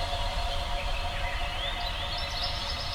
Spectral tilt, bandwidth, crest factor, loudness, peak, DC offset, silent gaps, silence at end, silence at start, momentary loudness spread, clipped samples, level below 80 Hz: -3 dB/octave; 18.5 kHz; 14 dB; -32 LUFS; -18 dBFS; under 0.1%; none; 0 s; 0 s; 2 LU; under 0.1%; -34 dBFS